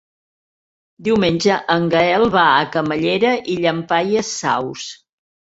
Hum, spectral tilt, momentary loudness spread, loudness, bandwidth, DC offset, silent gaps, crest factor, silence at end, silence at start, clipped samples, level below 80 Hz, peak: none; -4.5 dB/octave; 8 LU; -17 LUFS; 8 kHz; under 0.1%; none; 16 dB; 0.55 s; 1 s; under 0.1%; -52 dBFS; -2 dBFS